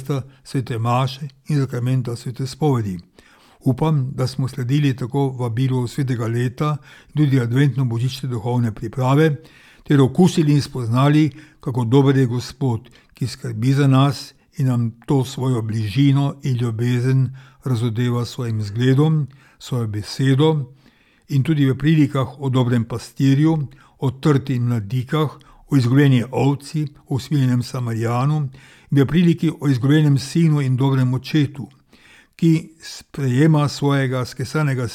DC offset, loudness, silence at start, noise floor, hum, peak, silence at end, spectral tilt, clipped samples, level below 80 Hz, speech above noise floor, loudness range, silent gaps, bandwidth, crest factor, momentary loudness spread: under 0.1%; -19 LUFS; 0 s; -54 dBFS; none; -4 dBFS; 0 s; -7.5 dB/octave; under 0.1%; -52 dBFS; 36 dB; 4 LU; none; 13.5 kHz; 16 dB; 11 LU